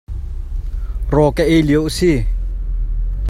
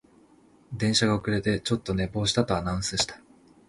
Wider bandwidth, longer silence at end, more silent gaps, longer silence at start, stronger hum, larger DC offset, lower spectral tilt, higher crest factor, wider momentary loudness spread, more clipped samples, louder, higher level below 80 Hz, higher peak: first, 15 kHz vs 11.5 kHz; second, 0 s vs 0.5 s; neither; second, 0.1 s vs 0.7 s; neither; neither; first, -6.5 dB/octave vs -4.5 dB/octave; about the same, 16 dB vs 20 dB; first, 15 LU vs 6 LU; neither; first, -17 LUFS vs -26 LUFS; first, -20 dBFS vs -46 dBFS; first, 0 dBFS vs -8 dBFS